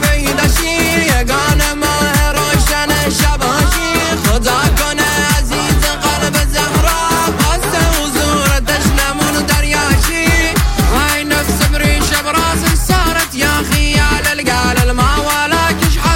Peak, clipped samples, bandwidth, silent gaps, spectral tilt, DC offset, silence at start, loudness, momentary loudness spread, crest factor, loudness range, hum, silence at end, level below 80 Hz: 0 dBFS; under 0.1%; 17 kHz; none; -3.5 dB/octave; under 0.1%; 0 s; -12 LUFS; 2 LU; 12 dB; 1 LU; none; 0 s; -18 dBFS